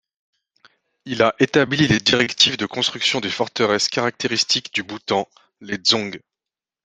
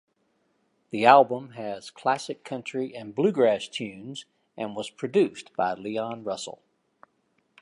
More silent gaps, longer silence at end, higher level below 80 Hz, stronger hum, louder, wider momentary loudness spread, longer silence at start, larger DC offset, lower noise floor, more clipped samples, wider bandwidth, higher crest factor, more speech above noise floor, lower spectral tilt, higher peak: neither; second, 0.65 s vs 1.1 s; first, -56 dBFS vs -74 dBFS; neither; first, -19 LUFS vs -26 LUFS; second, 10 LU vs 17 LU; about the same, 1.05 s vs 0.95 s; neither; first, -88 dBFS vs -71 dBFS; neither; second, 9.6 kHz vs 11.5 kHz; about the same, 22 dB vs 24 dB; first, 68 dB vs 45 dB; second, -3.5 dB/octave vs -5 dB/octave; about the same, 0 dBFS vs -2 dBFS